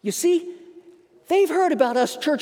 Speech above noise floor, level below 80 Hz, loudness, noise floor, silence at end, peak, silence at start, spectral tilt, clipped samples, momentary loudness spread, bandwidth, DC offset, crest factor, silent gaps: 31 dB; -80 dBFS; -21 LUFS; -51 dBFS; 0 s; -4 dBFS; 0.05 s; -3.5 dB/octave; under 0.1%; 5 LU; 18 kHz; under 0.1%; 18 dB; none